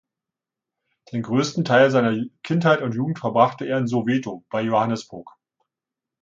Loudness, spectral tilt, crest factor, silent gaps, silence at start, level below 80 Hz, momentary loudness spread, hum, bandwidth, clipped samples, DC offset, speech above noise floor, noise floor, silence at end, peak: -21 LUFS; -6.5 dB/octave; 20 dB; none; 1.1 s; -66 dBFS; 12 LU; none; 7.8 kHz; under 0.1%; under 0.1%; 66 dB; -87 dBFS; 0.95 s; -2 dBFS